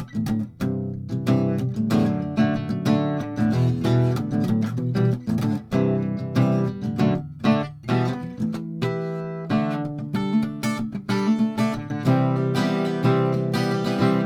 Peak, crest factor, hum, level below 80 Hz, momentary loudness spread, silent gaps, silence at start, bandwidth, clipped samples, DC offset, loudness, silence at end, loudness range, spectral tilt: -8 dBFS; 14 dB; none; -52 dBFS; 6 LU; none; 0 s; 15 kHz; under 0.1%; under 0.1%; -23 LUFS; 0 s; 3 LU; -7.5 dB/octave